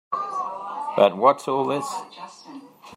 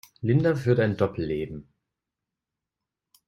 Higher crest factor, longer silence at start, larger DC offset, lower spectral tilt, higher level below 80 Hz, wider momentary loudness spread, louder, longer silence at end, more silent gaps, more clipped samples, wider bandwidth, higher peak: about the same, 22 dB vs 18 dB; about the same, 0.1 s vs 0.2 s; neither; second, -5 dB/octave vs -8.5 dB/octave; second, -76 dBFS vs -56 dBFS; first, 23 LU vs 12 LU; about the same, -23 LUFS vs -25 LUFS; second, 0 s vs 1.65 s; neither; neither; about the same, 14 kHz vs 14 kHz; first, -2 dBFS vs -8 dBFS